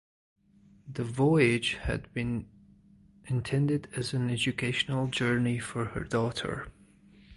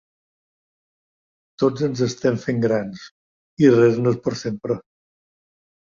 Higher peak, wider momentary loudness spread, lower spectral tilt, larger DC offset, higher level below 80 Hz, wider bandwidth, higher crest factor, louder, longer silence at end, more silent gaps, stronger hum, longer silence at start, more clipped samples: second, -12 dBFS vs -2 dBFS; about the same, 11 LU vs 12 LU; second, -5.5 dB/octave vs -7 dB/octave; neither; first, -50 dBFS vs -60 dBFS; first, 11.5 kHz vs 7.6 kHz; about the same, 20 dB vs 20 dB; second, -30 LUFS vs -20 LUFS; second, 0 s vs 1.15 s; second, none vs 3.11-3.57 s; neither; second, 0.85 s vs 1.6 s; neither